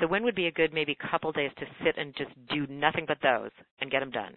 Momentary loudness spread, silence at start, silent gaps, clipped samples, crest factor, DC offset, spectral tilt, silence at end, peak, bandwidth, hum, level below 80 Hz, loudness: 8 LU; 0 s; 3.71-3.77 s; under 0.1%; 24 dB; under 0.1%; -9 dB/octave; 0.05 s; -6 dBFS; 4.4 kHz; none; -62 dBFS; -29 LUFS